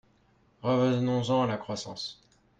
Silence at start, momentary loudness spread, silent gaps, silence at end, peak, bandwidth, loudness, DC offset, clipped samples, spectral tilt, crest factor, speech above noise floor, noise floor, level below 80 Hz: 0.65 s; 12 LU; none; 0.45 s; -16 dBFS; 9 kHz; -29 LUFS; under 0.1%; under 0.1%; -6.5 dB/octave; 14 dB; 37 dB; -65 dBFS; -64 dBFS